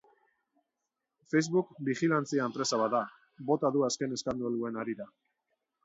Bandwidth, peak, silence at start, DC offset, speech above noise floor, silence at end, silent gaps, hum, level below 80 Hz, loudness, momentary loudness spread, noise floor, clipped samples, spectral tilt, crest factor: 8 kHz; -16 dBFS; 1.3 s; under 0.1%; 56 dB; 0.8 s; none; none; -72 dBFS; -31 LUFS; 10 LU; -87 dBFS; under 0.1%; -5 dB/octave; 18 dB